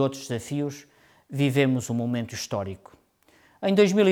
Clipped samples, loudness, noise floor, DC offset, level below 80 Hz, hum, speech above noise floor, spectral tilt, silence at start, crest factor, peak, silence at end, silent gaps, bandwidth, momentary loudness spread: under 0.1%; -26 LUFS; -60 dBFS; under 0.1%; -66 dBFS; none; 36 dB; -6 dB/octave; 0 s; 18 dB; -8 dBFS; 0 s; none; 17.5 kHz; 16 LU